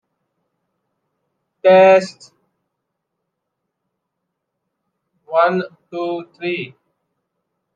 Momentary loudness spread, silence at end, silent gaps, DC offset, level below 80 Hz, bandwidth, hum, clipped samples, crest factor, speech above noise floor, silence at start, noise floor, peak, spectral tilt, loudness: 18 LU; 1.1 s; none; under 0.1%; -76 dBFS; 9 kHz; none; under 0.1%; 18 dB; 63 dB; 1.65 s; -77 dBFS; -2 dBFS; -6 dB/octave; -16 LUFS